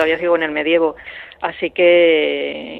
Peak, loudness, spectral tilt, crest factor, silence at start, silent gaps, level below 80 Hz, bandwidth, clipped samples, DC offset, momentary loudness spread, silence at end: -2 dBFS; -16 LUFS; -6 dB/octave; 14 dB; 0 s; none; -54 dBFS; 4.3 kHz; under 0.1%; under 0.1%; 14 LU; 0 s